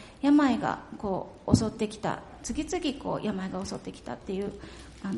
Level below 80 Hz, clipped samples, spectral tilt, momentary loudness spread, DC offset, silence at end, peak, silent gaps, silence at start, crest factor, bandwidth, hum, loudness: -50 dBFS; under 0.1%; -5.5 dB/octave; 16 LU; under 0.1%; 0 s; -6 dBFS; none; 0 s; 24 dB; 11.5 kHz; none; -30 LUFS